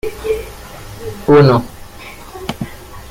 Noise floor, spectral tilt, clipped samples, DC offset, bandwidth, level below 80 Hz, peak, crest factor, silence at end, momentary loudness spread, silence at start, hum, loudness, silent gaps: -33 dBFS; -7 dB/octave; under 0.1%; under 0.1%; 16.5 kHz; -36 dBFS; 0 dBFS; 16 dB; 0.1 s; 24 LU; 0.05 s; none; -14 LUFS; none